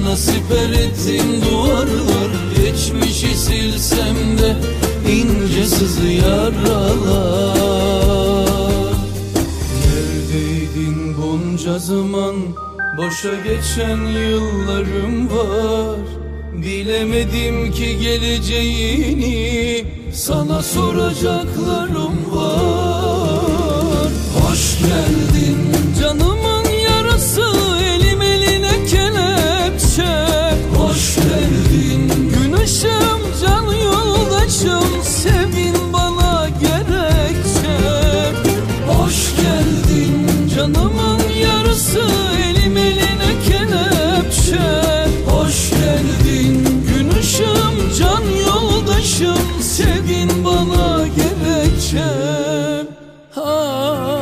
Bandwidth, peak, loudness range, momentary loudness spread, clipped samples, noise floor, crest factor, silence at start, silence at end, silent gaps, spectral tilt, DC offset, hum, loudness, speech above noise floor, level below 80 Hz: 15.5 kHz; 0 dBFS; 5 LU; 5 LU; under 0.1%; -37 dBFS; 14 dB; 0 s; 0 s; none; -5 dB/octave; under 0.1%; none; -15 LUFS; 21 dB; -22 dBFS